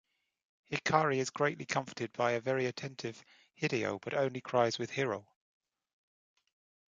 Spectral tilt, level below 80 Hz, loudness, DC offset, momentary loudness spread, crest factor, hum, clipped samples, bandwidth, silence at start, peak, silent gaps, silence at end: -4.5 dB/octave; -74 dBFS; -34 LUFS; under 0.1%; 11 LU; 24 dB; none; under 0.1%; 9 kHz; 0.7 s; -12 dBFS; none; 1.7 s